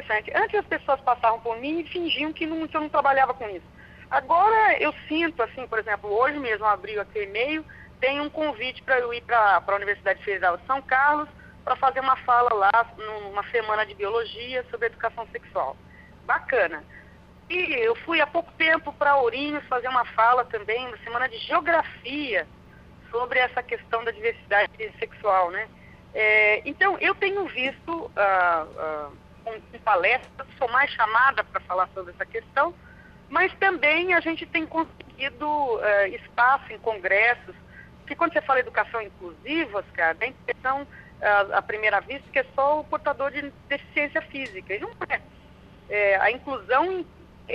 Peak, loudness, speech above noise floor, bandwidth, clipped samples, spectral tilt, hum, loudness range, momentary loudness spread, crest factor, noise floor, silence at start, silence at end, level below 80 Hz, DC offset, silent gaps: -8 dBFS; -24 LUFS; 25 dB; 6.8 kHz; under 0.1%; -6 dB/octave; none; 4 LU; 12 LU; 18 dB; -50 dBFS; 0 s; 0 s; -56 dBFS; under 0.1%; none